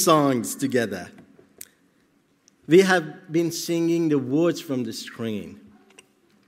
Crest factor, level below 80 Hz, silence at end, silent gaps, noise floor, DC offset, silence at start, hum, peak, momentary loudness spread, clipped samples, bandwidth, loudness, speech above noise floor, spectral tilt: 20 dB; -72 dBFS; 0.95 s; none; -63 dBFS; under 0.1%; 0 s; none; -4 dBFS; 25 LU; under 0.1%; 16 kHz; -23 LUFS; 41 dB; -5 dB/octave